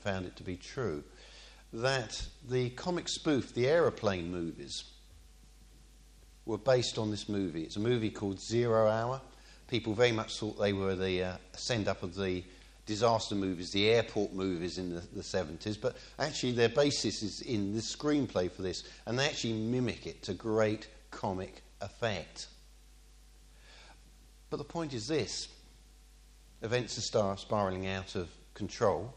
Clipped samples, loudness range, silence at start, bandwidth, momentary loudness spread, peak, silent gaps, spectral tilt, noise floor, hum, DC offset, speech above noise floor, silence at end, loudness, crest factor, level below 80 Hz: under 0.1%; 8 LU; 0 s; 11.5 kHz; 13 LU; -12 dBFS; none; -5 dB/octave; -58 dBFS; none; under 0.1%; 24 dB; 0 s; -34 LUFS; 22 dB; -56 dBFS